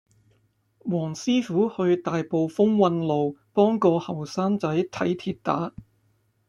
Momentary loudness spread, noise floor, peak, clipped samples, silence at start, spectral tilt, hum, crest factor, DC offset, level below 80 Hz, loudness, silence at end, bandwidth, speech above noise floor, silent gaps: 8 LU; -67 dBFS; -6 dBFS; under 0.1%; 0.85 s; -7 dB/octave; none; 18 dB; under 0.1%; -64 dBFS; -24 LUFS; 0.7 s; 11.5 kHz; 43 dB; none